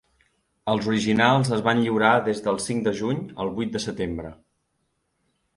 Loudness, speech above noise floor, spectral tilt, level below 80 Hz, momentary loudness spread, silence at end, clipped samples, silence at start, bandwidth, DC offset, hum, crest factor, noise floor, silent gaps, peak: -23 LUFS; 51 dB; -5.5 dB/octave; -54 dBFS; 11 LU; 1.2 s; under 0.1%; 0.65 s; 11.5 kHz; under 0.1%; none; 22 dB; -73 dBFS; none; -2 dBFS